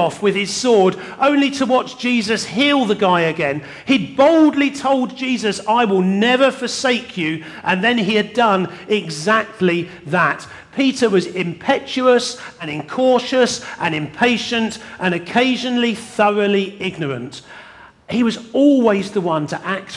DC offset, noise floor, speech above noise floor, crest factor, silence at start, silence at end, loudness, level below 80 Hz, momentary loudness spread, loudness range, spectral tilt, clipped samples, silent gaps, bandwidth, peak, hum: under 0.1%; -42 dBFS; 25 dB; 16 dB; 0 s; 0 s; -17 LUFS; -60 dBFS; 9 LU; 3 LU; -4.5 dB/octave; under 0.1%; none; 12 kHz; -2 dBFS; none